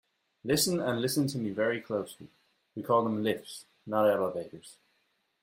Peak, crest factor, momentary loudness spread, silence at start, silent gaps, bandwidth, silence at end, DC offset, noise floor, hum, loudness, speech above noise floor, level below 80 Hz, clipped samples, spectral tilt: -12 dBFS; 18 dB; 18 LU; 0.45 s; none; 16 kHz; 0.7 s; under 0.1%; -75 dBFS; none; -30 LUFS; 45 dB; -70 dBFS; under 0.1%; -4.5 dB/octave